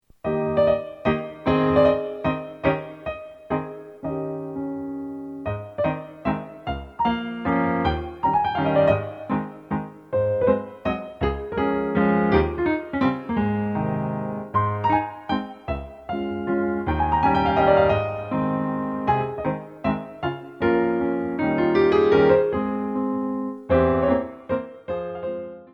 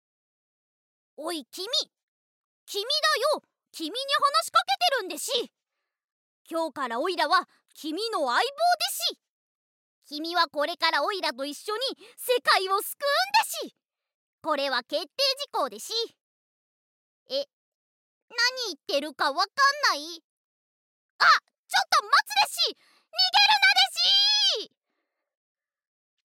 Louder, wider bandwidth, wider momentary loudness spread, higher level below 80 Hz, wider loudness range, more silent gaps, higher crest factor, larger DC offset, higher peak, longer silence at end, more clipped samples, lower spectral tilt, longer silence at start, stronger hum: about the same, -23 LUFS vs -24 LUFS; second, 6.2 kHz vs 17 kHz; second, 12 LU vs 15 LU; first, -42 dBFS vs under -90 dBFS; about the same, 7 LU vs 8 LU; second, none vs 2.03-2.66 s, 6.12-6.45 s, 9.29-10.02 s, 14.14-14.38 s, 16.23-17.26 s, 17.53-18.28 s, 20.24-21.19 s, 21.58-21.64 s; about the same, 18 dB vs 22 dB; neither; about the same, -4 dBFS vs -6 dBFS; second, 0.1 s vs 1.7 s; neither; first, -9 dB/octave vs 1 dB/octave; second, 0.25 s vs 1.2 s; neither